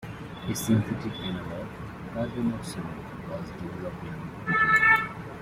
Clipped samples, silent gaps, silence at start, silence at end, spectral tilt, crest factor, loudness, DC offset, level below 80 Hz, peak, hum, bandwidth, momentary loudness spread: under 0.1%; none; 0 s; 0 s; -5 dB/octave; 20 dB; -27 LUFS; under 0.1%; -52 dBFS; -8 dBFS; none; 16 kHz; 18 LU